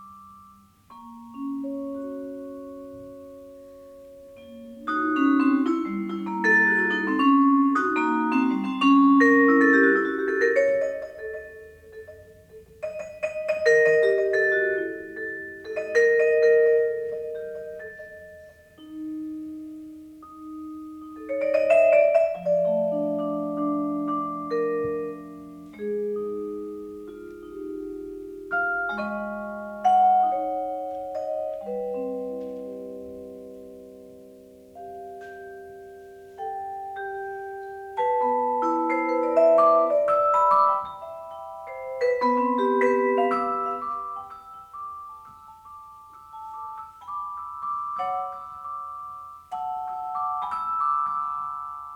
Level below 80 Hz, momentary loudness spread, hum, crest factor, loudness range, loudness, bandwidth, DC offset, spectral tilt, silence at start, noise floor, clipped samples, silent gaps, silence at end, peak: -64 dBFS; 23 LU; none; 18 dB; 17 LU; -23 LUFS; 9.4 kHz; under 0.1%; -6 dB/octave; 0 s; -53 dBFS; under 0.1%; none; 0 s; -8 dBFS